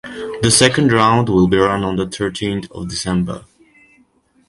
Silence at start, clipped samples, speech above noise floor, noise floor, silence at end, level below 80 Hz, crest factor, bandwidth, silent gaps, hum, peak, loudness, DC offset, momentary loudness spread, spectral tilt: 0.05 s; under 0.1%; 40 dB; -56 dBFS; 1.1 s; -40 dBFS; 16 dB; 11.5 kHz; none; none; 0 dBFS; -15 LUFS; under 0.1%; 14 LU; -4.5 dB/octave